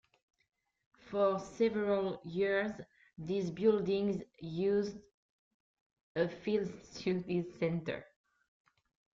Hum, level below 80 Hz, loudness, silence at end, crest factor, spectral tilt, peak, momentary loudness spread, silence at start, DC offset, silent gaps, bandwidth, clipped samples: none; -70 dBFS; -35 LUFS; 1.15 s; 18 dB; -7 dB/octave; -18 dBFS; 11 LU; 1.05 s; under 0.1%; 5.14-6.15 s; 7.6 kHz; under 0.1%